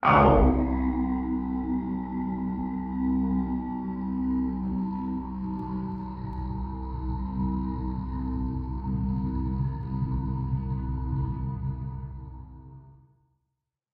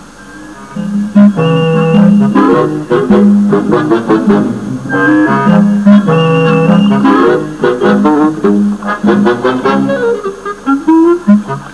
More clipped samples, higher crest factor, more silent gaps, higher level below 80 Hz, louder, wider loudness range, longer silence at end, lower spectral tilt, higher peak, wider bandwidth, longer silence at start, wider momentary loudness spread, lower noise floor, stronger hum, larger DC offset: second, under 0.1% vs 1%; first, 22 dB vs 8 dB; neither; first, -34 dBFS vs -44 dBFS; second, -29 LUFS vs -9 LUFS; about the same, 4 LU vs 3 LU; first, 1 s vs 0 s; first, -11 dB/octave vs -8 dB/octave; second, -6 dBFS vs 0 dBFS; second, 5 kHz vs 11 kHz; about the same, 0 s vs 0 s; about the same, 9 LU vs 8 LU; first, -83 dBFS vs -30 dBFS; neither; second, under 0.1% vs 0.6%